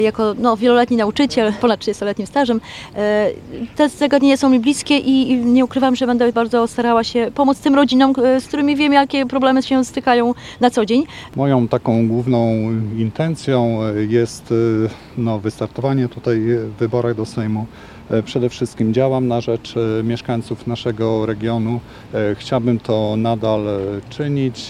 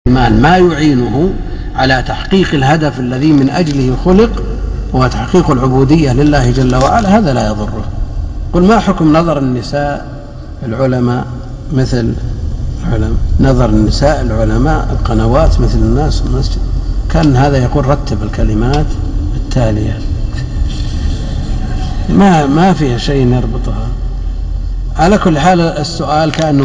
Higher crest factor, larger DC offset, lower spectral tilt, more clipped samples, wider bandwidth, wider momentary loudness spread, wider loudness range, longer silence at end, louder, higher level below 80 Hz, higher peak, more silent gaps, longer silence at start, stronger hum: first, 16 dB vs 10 dB; neither; about the same, -6.5 dB/octave vs -7 dB/octave; neither; first, 12 kHz vs 9.6 kHz; about the same, 9 LU vs 11 LU; about the same, 5 LU vs 5 LU; about the same, 0 s vs 0 s; second, -17 LUFS vs -12 LUFS; second, -48 dBFS vs -18 dBFS; about the same, 0 dBFS vs 0 dBFS; neither; about the same, 0 s vs 0.05 s; neither